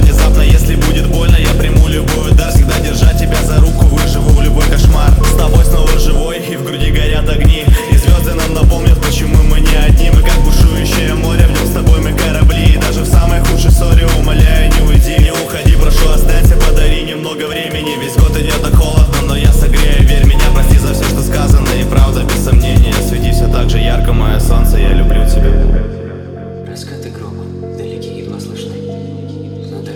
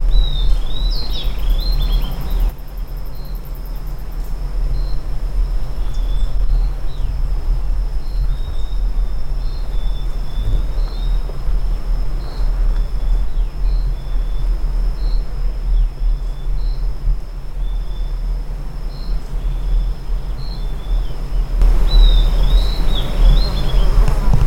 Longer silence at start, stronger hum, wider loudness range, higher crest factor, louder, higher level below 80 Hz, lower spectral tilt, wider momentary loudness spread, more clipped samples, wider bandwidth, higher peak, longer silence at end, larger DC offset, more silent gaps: about the same, 0 s vs 0 s; neither; second, 4 LU vs 7 LU; second, 8 dB vs 14 dB; first, -11 LUFS vs -23 LUFS; first, -10 dBFS vs -16 dBFS; about the same, -5.5 dB/octave vs -6 dB/octave; first, 14 LU vs 10 LU; first, 0.9% vs under 0.1%; first, 19 kHz vs 13.5 kHz; about the same, 0 dBFS vs 0 dBFS; about the same, 0 s vs 0 s; neither; neither